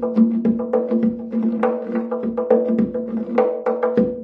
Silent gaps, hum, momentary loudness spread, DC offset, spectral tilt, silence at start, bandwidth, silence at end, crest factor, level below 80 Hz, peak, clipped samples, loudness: none; none; 6 LU; under 0.1%; -10.5 dB/octave; 0 s; 4.2 kHz; 0 s; 16 dB; -54 dBFS; -4 dBFS; under 0.1%; -20 LUFS